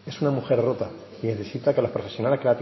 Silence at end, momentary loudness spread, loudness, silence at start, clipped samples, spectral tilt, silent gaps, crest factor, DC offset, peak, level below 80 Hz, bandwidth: 0 s; 8 LU; -25 LUFS; 0.05 s; under 0.1%; -8 dB/octave; none; 16 dB; under 0.1%; -8 dBFS; -58 dBFS; 6 kHz